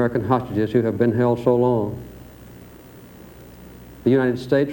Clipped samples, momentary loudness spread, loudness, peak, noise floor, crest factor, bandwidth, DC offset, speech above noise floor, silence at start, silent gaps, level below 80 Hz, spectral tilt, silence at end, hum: under 0.1%; 18 LU; -20 LUFS; -4 dBFS; -43 dBFS; 18 dB; over 20 kHz; under 0.1%; 24 dB; 0 s; none; -48 dBFS; -8.5 dB/octave; 0 s; none